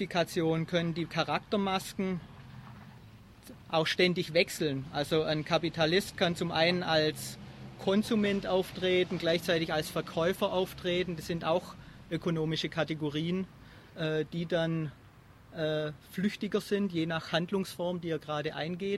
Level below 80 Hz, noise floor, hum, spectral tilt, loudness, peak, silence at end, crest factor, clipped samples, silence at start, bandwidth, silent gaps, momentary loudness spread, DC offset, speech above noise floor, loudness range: -60 dBFS; -56 dBFS; none; -5.5 dB/octave; -31 LUFS; -12 dBFS; 0 s; 20 dB; under 0.1%; 0 s; 14 kHz; none; 12 LU; under 0.1%; 25 dB; 5 LU